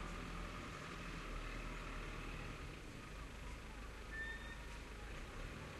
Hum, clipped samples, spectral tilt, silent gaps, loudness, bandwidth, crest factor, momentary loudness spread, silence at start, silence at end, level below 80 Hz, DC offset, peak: none; under 0.1%; -4.5 dB/octave; none; -50 LUFS; 13 kHz; 14 dB; 5 LU; 0 s; 0 s; -52 dBFS; under 0.1%; -36 dBFS